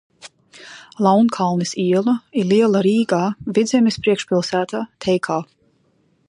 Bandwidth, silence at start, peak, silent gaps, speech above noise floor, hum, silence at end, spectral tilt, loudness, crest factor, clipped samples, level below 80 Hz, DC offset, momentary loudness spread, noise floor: 11 kHz; 0.25 s; -2 dBFS; none; 44 dB; none; 0.85 s; -6 dB/octave; -18 LUFS; 16 dB; under 0.1%; -60 dBFS; under 0.1%; 9 LU; -61 dBFS